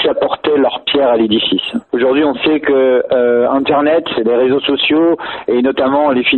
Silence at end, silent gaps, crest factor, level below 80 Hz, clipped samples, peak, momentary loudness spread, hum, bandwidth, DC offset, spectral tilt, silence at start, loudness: 0 s; none; 12 dB; -50 dBFS; under 0.1%; 0 dBFS; 3 LU; none; 4.3 kHz; under 0.1%; -7 dB/octave; 0 s; -13 LUFS